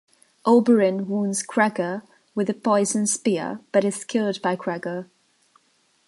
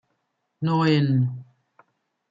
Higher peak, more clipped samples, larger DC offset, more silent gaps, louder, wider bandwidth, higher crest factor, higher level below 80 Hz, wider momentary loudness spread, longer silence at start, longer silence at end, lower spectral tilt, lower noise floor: first, -4 dBFS vs -8 dBFS; neither; neither; neither; about the same, -22 LUFS vs -22 LUFS; first, 11.5 kHz vs 7.4 kHz; about the same, 20 dB vs 16 dB; second, -74 dBFS vs -68 dBFS; about the same, 11 LU vs 10 LU; second, 0.45 s vs 0.6 s; first, 1.05 s vs 0.9 s; second, -4.5 dB/octave vs -8.5 dB/octave; second, -65 dBFS vs -75 dBFS